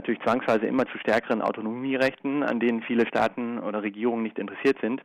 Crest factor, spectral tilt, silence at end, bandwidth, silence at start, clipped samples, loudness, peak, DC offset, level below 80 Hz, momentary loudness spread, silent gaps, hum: 14 dB; -6.5 dB/octave; 0 s; 11 kHz; 0 s; under 0.1%; -26 LUFS; -12 dBFS; under 0.1%; -66 dBFS; 6 LU; none; none